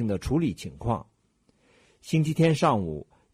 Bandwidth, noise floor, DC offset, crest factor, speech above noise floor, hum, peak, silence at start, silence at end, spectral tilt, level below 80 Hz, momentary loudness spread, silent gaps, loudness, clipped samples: 14.5 kHz; -67 dBFS; under 0.1%; 18 dB; 42 dB; none; -10 dBFS; 0 s; 0.3 s; -7 dB/octave; -46 dBFS; 13 LU; none; -26 LUFS; under 0.1%